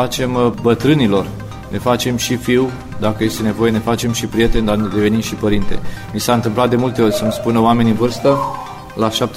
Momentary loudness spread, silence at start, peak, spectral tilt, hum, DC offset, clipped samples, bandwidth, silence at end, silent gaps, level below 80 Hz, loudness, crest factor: 9 LU; 0 s; -2 dBFS; -5.5 dB/octave; none; under 0.1%; under 0.1%; 16 kHz; 0 s; none; -30 dBFS; -16 LUFS; 14 dB